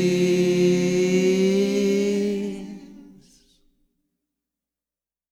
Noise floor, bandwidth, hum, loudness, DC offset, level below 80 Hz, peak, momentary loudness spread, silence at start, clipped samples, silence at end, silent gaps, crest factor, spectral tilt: under -90 dBFS; 14.5 kHz; none; -21 LUFS; under 0.1%; -60 dBFS; -10 dBFS; 14 LU; 0 s; under 0.1%; 2.3 s; none; 14 dB; -6 dB/octave